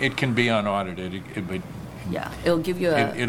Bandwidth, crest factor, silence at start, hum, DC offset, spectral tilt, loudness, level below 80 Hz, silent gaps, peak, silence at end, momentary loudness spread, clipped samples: 17.5 kHz; 18 dB; 0 s; none; under 0.1%; -6 dB/octave; -25 LUFS; -48 dBFS; none; -6 dBFS; 0 s; 11 LU; under 0.1%